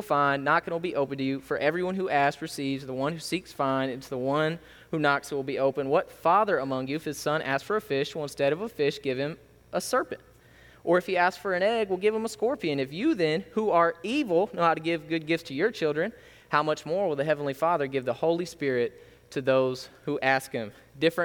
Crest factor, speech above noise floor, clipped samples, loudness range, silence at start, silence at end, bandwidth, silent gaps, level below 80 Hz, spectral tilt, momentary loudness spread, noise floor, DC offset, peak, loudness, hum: 20 dB; 27 dB; under 0.1%; 3 LU; 0 s; 0 s; 19.5 kHz; none; -64 dBFS; -5.5 dB/octave; 8 LU; -55 dBFS; under 0.1%; -8 dBFS; -27 LUFS; none